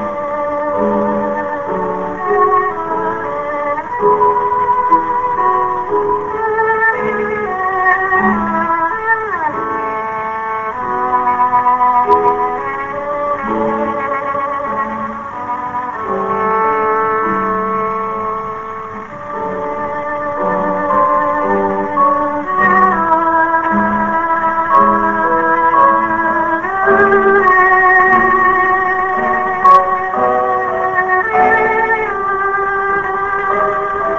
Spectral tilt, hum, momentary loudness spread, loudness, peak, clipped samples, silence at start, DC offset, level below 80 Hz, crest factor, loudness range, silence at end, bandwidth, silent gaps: -7.5 dB/octave; none; 10 LU; -14 LUFS; 0 dBFS; under 0.1%; 0 s; under 0.1%; -46 dBFS; 14 dB; 7 LU; 0 s; 7.6 kHz; none